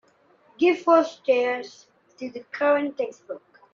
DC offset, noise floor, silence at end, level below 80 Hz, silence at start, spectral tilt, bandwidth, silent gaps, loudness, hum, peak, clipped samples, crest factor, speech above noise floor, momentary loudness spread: under 0.1%; -59 dBFS; 0.35 s; -78 dBFS; 0.6 s; -4 dB/octave; 7.4 kHz; none; -23 LUFS; none; -6 dBFS; under 0.1%; 18 dB; 36 dB; 20 LU